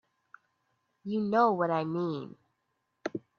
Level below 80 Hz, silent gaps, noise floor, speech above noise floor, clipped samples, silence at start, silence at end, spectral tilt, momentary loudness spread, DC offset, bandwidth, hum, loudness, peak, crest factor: -78 dBFS; none; -80 dBFS; 51 dB; under 0.1%; 1.05 s; 0.2 s; -8 dB/octave; 17 LU; under 0.1%; 6.8 kHz; none; -30 LUFS; -14 dBFS; 18 dB